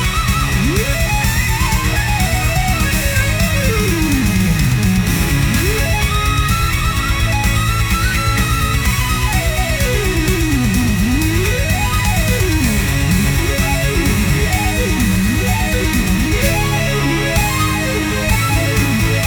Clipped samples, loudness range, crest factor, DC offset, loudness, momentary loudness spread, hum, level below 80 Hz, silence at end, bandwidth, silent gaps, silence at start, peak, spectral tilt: under 0.1%; 1 LU; 12 dB; under 0.1%; -15 LUFS; 1 LU; none; -20 dBFS; 0 s; over 20 kHz; none; 0 s; -2 dBFS; -4.5 dB/octave